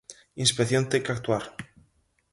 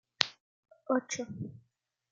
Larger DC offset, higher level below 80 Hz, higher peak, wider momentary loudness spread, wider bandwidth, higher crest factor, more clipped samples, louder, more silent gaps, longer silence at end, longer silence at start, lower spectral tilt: neither; first, -60 dBFS vs -78 dBFS; second, -8 dBFS vs 0 dBFS; first, 19 LU vs 13 LU; first, 11.5 kHz vs 9.4 kHz; second, 22 dB vs 38 dB; neither; first, -25 LUFS vs -35 LUFS; second, none vs 0.40-0.63 s; about the same, 0.65 s vs 0.55 s; about the same, 0.1 s vs 0.2 s; about the same, -4 dB/octave vs -3 dB/octave